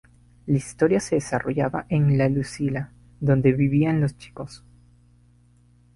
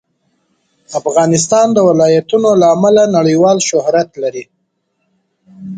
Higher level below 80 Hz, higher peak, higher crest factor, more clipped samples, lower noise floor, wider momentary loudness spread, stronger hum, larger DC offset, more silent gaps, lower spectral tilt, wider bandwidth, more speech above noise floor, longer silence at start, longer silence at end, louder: first, -50 dBFS vs -58 dBFS; second, -6 dBFS vs 0 dBFS; first, 18 dB vs 12 dB; neither; second, -56 dBFS vs -66 dBFS; first, 18 LU vs 11 LU; first, 60 Hz at -40 dBFS vs none; neither; neither; first, -7.5 dB/octave vs -5 dB/octave; first, 11.5 kHz vs 9.4 kHz; second, 35 dB vs 55 dB; second, 0.45 s vs 0.9 s; first, 1.4 s vs 0 s; second, -23 LUFS vs -11 LUFS